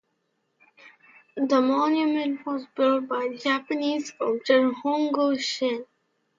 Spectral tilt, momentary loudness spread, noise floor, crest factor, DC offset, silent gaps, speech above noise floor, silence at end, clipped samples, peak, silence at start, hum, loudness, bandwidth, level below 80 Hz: -3.5 dB/octave; 8 LU; -74 dBFS; 18 dB; under 0.1%; none; 50 dB; 0.55 s; under 0.1%; -6 dBFS; 0.85 s; none; -25 LUFS; 7.6 kHz; -78 dBFS